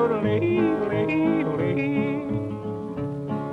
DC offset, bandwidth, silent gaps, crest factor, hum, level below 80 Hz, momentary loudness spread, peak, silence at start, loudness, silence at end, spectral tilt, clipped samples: under 0.1%; 6.2 kHz; none; 14 dB; none; -54 dBFS; 9 LU; -10 dBFS; 0 s; -25 LUFS; 0 s; -9 dB/octave; under 0.1%